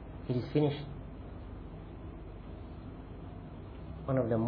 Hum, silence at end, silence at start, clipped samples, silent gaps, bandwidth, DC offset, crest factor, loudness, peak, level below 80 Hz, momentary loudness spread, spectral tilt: none; 0 s; 0 s; under 0.1%; none; 5.2 kHz; under 0.1%; 20 dB; -38 LUFS; -16 dBFS; -50 dBFS; 16 LU; -8 dB/octave